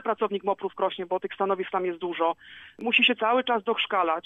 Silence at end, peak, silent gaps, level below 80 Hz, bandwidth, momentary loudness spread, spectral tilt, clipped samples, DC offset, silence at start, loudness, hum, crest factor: 0.05 s; -8 dBFS; none; -74 dBFS; 7.2 kHz; 10 LU; -5.5 dB/octave; under 0.1%; under 0.1%; 0 s; -26 LUFS; none; 18 dB